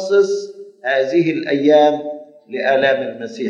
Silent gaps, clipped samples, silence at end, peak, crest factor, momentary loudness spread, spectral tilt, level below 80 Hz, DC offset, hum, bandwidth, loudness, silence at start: none; under 0.1%; 0 s; -2 dBFS; 16 dB; 17 LU; -5.5 dB/octave; -74 dBFS; under 0.1%; none; 7.8 kHz; -16 LUFS; 0 s